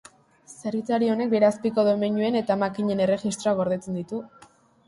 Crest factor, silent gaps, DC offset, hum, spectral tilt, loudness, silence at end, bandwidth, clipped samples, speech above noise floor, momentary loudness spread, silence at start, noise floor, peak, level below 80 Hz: 16 dB; none; under 0.1%; none; -6 dB/octave; -24 LUFS; 0.6 s; 11.5 kHz; under 0.1%; 28 dB; 10 LU; 0.5 s; -52 dBFS; -8 dBFS; -64 dBFS